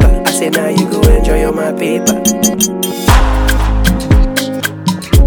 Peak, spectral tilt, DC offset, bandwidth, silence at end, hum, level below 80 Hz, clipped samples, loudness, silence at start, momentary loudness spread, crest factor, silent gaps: 0 dBFS; -4.5 dB/octave; under 0.1%; over 20 kHz; 0 s; none; -14 dBFS; 0.2%; -12 LUFS; 0 s; 5 LU; 10 dB; none